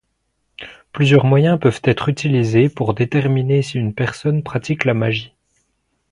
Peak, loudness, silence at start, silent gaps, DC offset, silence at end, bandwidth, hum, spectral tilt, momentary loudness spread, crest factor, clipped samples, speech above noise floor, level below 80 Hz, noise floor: 0 dBFS; -17 LUFS; 0.6 s; none; under 0.1%; 0.85 s; 10.5 kHz; none; -7.5 dB/octave; 9 LU; 16 dB; under 0.1%; 54 dB; -50 dBFS; -69 dBFS